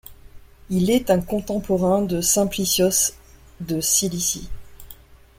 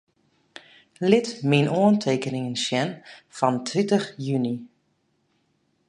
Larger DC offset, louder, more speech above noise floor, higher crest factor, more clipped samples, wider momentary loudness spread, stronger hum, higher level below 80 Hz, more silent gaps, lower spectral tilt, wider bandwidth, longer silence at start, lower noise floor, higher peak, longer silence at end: neither; first, -20 LUFS vs -23 LUFS; second, 25 dB vs 47 dB; about the same, 18 dB vs 22 dB; neither; about the same, 9 LU vs 10 LU; neither; first, -42 dBFS vs -70 dBFS; neither; second, -4 dB/octave vs -5.5 dB/octave; first, 16.5 kHz vs 10.5 kHz; second, 0.1 s vs 1 s; second, -45 dBFS vs -70 dBFS; about the same, -4 dBFS vs -2 dBFS; second, 0.25 s vs 1.2 s